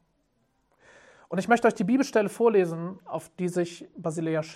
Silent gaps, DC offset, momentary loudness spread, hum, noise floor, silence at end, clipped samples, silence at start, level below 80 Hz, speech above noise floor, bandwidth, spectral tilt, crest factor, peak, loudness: none; under 0.1%; 13 LU; none; -71 dBFS; 0 s; under 0.1%; 1.3 s; -72 dBFS; 46 dB; 14 kHz; -6 dB/octave; 18 dB; -8 dBFS; -26 LUFS